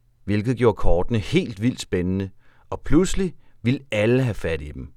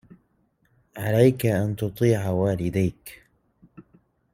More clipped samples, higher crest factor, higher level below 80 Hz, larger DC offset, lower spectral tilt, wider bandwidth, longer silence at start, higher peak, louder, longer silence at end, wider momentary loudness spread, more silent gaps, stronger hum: neither; about the same, 18 dB vs 20 dB; first, -32 dBFS vs -54 dBFS; neither; about the same, -6.5 dB/octave vs -7.5 dB/octave; second, 12.5 kHz vs 16.5 kHz; second, 0.25 s vs 0.95 s; about the same, -4 dBFS vs -4 dBFS; about the same, -23 LUFS vs -23 LUFS; second, 0.1 s vs 0.55 s; second, 9 LU vs 20 LU; neither; neither